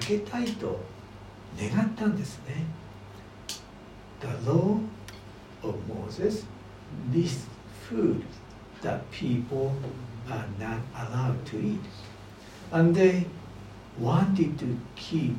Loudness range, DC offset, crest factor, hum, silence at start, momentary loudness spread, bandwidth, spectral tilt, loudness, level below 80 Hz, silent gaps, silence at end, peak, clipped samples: 6 LU; under 0.1%; 20 dB; 50 Hz at -50 dBFS; 0 s; 21 LU; 15.5 kHz; -7 dB/octave; -29 LUFS; -56 dBFS; none; 0 s; -10 dBFS; under 0.1%